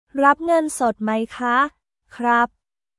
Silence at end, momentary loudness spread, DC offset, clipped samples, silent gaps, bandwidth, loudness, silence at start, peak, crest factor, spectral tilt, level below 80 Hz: 0.55 s; 7 LU; under 0.1%; under 0.1%; none; 12 kHz; -20 LUFS; 0.15 s; -2 dBFS; 20 dB; -4 dB/octave; -60 dBFS